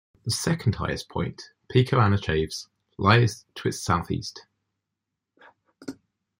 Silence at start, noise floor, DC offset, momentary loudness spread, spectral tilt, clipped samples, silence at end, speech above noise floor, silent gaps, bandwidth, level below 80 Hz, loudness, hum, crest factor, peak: 0.25 s; -84 dBFS; under 0.1%; 21 LU; -5.5 dB/octave; under 0.1%; 0.45 s; 60 dB; none; 16 kHz; -50 dBFS; -25 LUFS; none; 24 dB; -2 dBFS